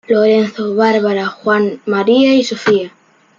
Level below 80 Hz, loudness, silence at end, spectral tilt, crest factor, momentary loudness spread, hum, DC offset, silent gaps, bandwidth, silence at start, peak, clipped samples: -62 dBFS; -13 LUFS; 0.5 s; -5.5 dB/octave; 12 dB; 6 LU; none; under 0.1%; none; 7.6 kHz; 0.1 s; -2 dBFS; under 0.1%